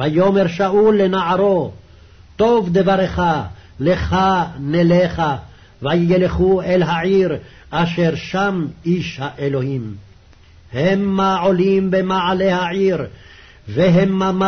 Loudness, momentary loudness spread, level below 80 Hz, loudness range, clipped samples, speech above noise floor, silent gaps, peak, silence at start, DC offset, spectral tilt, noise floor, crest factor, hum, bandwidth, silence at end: -17 LUFS; 10 LU; -40 dBFS; 4 LU; under 0.1%; 30 dB; none; -6 dBFS; 0 s; 0.2%; -7.5 dB/octave; -46 dBFS; 12 dB; none; 6.6 kHz; 0 s